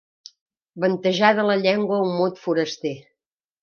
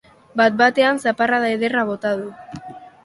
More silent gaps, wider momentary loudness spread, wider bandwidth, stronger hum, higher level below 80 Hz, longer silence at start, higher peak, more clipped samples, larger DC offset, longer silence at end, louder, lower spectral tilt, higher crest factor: neither; second, 11 LU vs 21 LU; second, 7 kHz vs 11.5 kHz; neither; second, -74 dBFS vs -60 dBFS; first, 0.75 s vs 0.35 s; about the same, -2 dBFS vs -2 dBFS; neither; neither; first, 0.6 s vs 0.15 s; second, -21 LUFS vs -18 LUFS; about the same, -5.5 dB/octave vs -4.5 dB/octave; about the same, 20 dB vs 18 dB